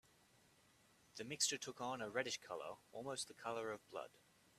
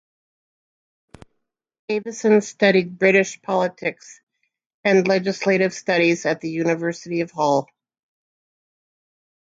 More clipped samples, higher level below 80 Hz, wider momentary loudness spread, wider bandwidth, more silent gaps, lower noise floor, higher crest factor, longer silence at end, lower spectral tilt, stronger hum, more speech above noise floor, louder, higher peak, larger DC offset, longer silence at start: neither; second, -86 dBFS vs -68 dBFS; first, 13 LU vs 9 LU; first, 14.5 kHz vs 8 kHz; second, none vs 4.23-4.27 s, 4.66-4.84 s; about the same, -73 dBFS vs -76 dBFS; about the same, 26 dB vs 22 dB; second, 0.4 s vs 1.85 s; second, -1.5 dB/octave vs -5 dB/octave; neither; second, 26 dB vs 56 dB; second, -45 LUFS vs -20 LUFS; second, -24 dBFS vs -2 dBFS; neither; second, 1.15 s vs 1.9 s